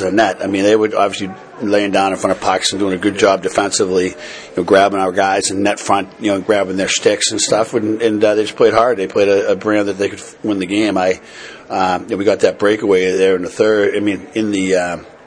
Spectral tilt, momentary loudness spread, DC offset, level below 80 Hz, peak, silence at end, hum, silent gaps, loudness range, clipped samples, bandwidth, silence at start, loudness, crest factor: -3.5 dB/octave; 8 LU; under 0.1%; -54 dBFS; 0 dBFS; 0.15 s; none; none; 2 LU; under 0.1%; 10.5 kHz; 0 s; -15 LUFS; 14 dB